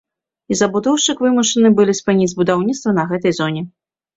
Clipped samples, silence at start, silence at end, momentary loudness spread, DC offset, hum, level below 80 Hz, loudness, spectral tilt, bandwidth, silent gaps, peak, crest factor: under 0.1%; 0.5 s; 0.5 s; 9 LU; under 0.1%; none; -56 dBFS; -16 LUFS; -4.5 dB/octave; 8 kHz; none; -2 dBFS; 14 dB